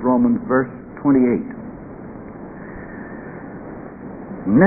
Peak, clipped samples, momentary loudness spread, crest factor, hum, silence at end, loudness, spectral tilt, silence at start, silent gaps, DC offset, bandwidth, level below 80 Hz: 0 dBFS; under 0.1%; 19 LU; 20 dB; none; 0 s; -19 LUFS; -15.5 dB/octave; 0 s; none; under 0.1%; 2.6 kHz; -48 dBFS